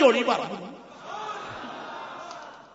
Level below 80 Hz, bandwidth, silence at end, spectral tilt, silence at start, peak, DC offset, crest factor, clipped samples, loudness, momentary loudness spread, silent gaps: -70 dBFS; 8 kHz; 0.05 s; -4 dB/octave; 0 s; -6 dBFS; under 0.1%; 22 dB; under 0.1%; -30 LUFS; 17 LU; none